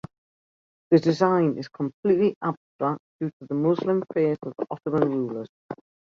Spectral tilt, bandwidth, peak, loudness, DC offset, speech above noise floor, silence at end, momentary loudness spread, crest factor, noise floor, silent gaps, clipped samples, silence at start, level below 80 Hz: -8.5 dB/octave; 7.4 kHz; -6 dBFS; -25 LUFS; under 0.1%; over 66 dB; 0.4 s; 12 LU; 20 dB; under -90 dBFS; 1.94-2.03 s, 2.36-2.41 s, 2.57-2.79 s, 3.00-3.19 s, 3.33-3.40 s, 5.49-5.69 s; under 0.1%; 0.9 s; -68 dBFS